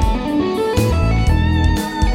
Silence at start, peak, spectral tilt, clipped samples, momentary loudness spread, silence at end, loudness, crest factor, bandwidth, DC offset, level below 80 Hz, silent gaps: 0 s; -2 dBFS; -6.5 dB/octave; under 0.1%; 3 LU; 0 s; -17 LUFS; 14 dB; 16.5 kHz; under 0.1%; -20 dBFS; none